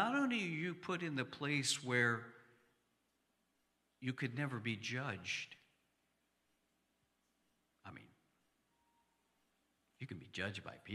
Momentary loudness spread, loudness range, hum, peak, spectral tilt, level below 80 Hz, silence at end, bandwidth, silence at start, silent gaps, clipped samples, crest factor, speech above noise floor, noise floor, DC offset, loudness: 21 LU; 13 LU; none; -22 dBFS; -4 dB/octave; -84 dBFS; 0 s; 14.5 kHz; 0 s; none; under 0.1%; 22 dB; 41 dB; -82 dBFS; under 0.1%; -40 LUFS